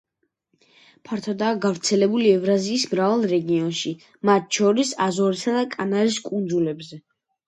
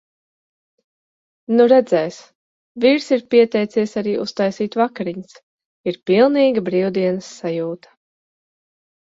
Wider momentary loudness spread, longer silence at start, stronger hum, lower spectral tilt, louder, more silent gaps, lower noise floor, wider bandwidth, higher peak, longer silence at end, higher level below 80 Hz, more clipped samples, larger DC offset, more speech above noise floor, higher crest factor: second, 9 LU vs 14 LU; second, 1.1 s vs 1.5 s; neither; second, -4.5 dB/octave vs -6 dB/octave; second, -22 LUFS vs -18 LUFS; second, none vs 2.35-2.75 s, 5.43-5.58 s, 5.65-5.84 s; second, -71 dBFS vs under -90 dBFS; first, 11 kHz vs 7.8 kHz; about the same, -4 dBFS vs -2 dBFS; second, 0.5 s vs 1.35 s; about the same, -68 dBFS vs -64 dBFS; neither; neither; second, 50 dB vs over 73 dB; about the same, 18 dB vs 18 dB